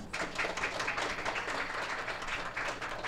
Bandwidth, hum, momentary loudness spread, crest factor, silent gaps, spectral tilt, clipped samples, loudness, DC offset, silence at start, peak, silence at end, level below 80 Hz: 16 kHz; none; 3 LU; 16 dB; none; -2.5 dB/octave; under 0.1%; -35 LUFS; under 0.1%; 0 s; -20 dBFS; 0 s; -52 dBFS